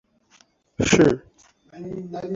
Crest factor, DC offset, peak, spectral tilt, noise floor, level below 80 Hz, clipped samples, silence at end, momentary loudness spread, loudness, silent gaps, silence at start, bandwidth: 22 dB; under 0.1%; -2 dBFS; -5 dB/octave; -59 dBFS; -48 dBFS; under 0.1%; 0 s; 22 LU; -20 LUFS; none; 0.8 s; 8 kHz